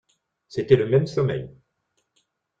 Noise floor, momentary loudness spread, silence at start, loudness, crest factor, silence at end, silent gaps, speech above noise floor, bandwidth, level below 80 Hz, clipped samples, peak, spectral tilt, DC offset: -74 dBFS; 15 LU; 0.5 s; -22 LUFS; 22 dB; 1.1 s; none; 53 dB; 7.6 kHz; -54 dBFS; under 0.1%; -4 dBFS; -8 dB/octave; under 0.1%